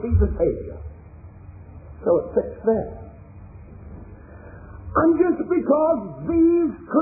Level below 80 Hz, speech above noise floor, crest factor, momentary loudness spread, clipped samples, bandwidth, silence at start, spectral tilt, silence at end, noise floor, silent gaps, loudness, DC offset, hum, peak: -36 dBFS; 22 dB; 16 dB; 25 LU; under 0.1%; 2.6 kHz; 0 s; -15.5 dB/octave; 0 s; -42 dBFS; none; -21 LUFS; under 0.1%; none; -6 dBFS